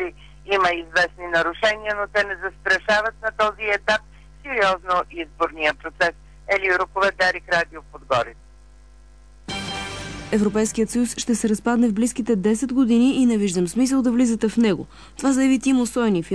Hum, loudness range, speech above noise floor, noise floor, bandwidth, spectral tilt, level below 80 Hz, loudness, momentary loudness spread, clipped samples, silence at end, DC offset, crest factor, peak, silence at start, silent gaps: none; 5 LU; 27 dB; -47 dBFS; 11 kHz; -4 dB/octave; -46 dBFS; -21 LUFS; 10 LU; under 0.1%; 0 s; 0.2%; 14 dB; -8 dBFS; 0 s; none